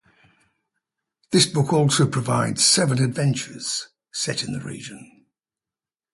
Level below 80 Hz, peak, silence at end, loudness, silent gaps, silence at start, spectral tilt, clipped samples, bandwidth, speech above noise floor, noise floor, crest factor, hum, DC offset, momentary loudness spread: -60 dBFS; -4 dBFS; 1.1 s; -21 LUFS; none; 1.3 s; -4 dB/octave; under 0.1%; 11.5 kHz; over 69 dB; under -90 dBFS; 20 dB; none; under 0.1%; 15 LU